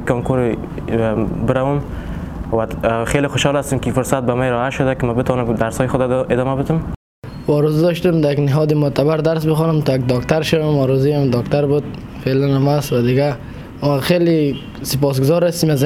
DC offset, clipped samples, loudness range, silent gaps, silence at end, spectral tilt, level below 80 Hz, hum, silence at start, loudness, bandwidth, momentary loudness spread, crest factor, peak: under 0.1%; under 0.1%; 3 LU; 6.96-7.22 s; 0 s; -6.5 dB/octave; -36 dBFS; none; 0 s; -17 LUFS; 16 kHz; 7 LU; 16 dB; 0 dBFS